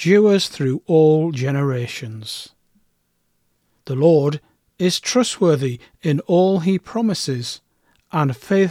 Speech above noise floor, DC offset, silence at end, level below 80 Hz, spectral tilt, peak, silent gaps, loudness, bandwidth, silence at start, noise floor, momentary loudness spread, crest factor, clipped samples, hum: 50 dB; under 0.1%; 0 s; -62 dBFS; -6 dB/octave; -2 dBFS; none; -19 LUFS; 15.5 kHz; 0 s; -67 dBFS; 15 LU; 16 dB; under 0.1%; none